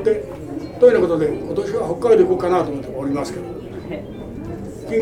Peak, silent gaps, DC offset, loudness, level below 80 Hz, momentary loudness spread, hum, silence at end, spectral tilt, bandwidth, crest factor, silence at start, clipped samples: -2 dBFS; none; under 0.1%; -18 LUFS; -44 dBFS; 17 LU; none; 0 s; -7 dB/octave; 12 kHz; 18 dB; 0 s; under 0.1%